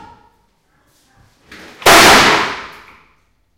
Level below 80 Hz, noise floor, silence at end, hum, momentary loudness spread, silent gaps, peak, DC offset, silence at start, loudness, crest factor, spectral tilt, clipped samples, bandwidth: -40 dBFS; -58 dBFS; 0.9 s; none; 16 LU; none; 0 dBFS; under 0.1%; 1.8 s; -8 LUFS; 14 dB; -1.5 dB/octave; 0.5%; over 20 kHz